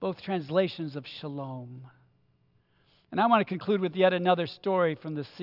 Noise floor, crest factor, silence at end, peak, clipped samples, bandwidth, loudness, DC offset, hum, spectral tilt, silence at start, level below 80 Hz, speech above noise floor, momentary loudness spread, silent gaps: -68 dBFS; 20 dB; 0 s; -10 dBFS; under 0.1%; 5.8 kHz; -28 LUFS; under 0.1%; none; -8.5 dB/octave; 0 s; -78 dBFS; 40 dB; 14 LU; none